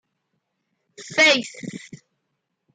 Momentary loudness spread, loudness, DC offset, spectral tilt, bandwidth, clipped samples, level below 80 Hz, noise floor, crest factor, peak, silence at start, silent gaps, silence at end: 21 LU; -17 LUFS; under 0.1%; -2 dB/octave; 9.6 kHz; under 0.1%; -76 dBFS; -77 dBFS; 22 dB; -4 dBFS; 1 s; none; 0.95 s